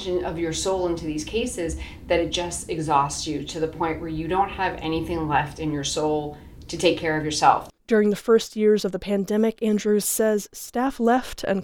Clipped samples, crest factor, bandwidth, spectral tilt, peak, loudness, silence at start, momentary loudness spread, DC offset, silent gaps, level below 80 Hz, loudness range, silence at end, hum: under 0.1%; 20 dB; 19.5 kHz; -4.5 dB/octave; -4 dBFS; -24 LUFS; 0 s; 8 LU; under 0.1%; none; -44 dBFS; 4 LU; 0 s; none